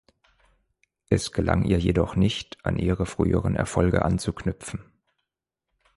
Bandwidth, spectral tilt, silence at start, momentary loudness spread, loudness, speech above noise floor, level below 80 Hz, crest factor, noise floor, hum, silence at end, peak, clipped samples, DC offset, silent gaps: 11.5 kHz; -6.5 dB/octave; 1.1 s; 9 LU; -25 LUFS; 61 dB; -38 dBFS; 20 dB; -84 dBFS; none; 1.15 s; -6 dBFS; under 0.1%; under 0.1%; none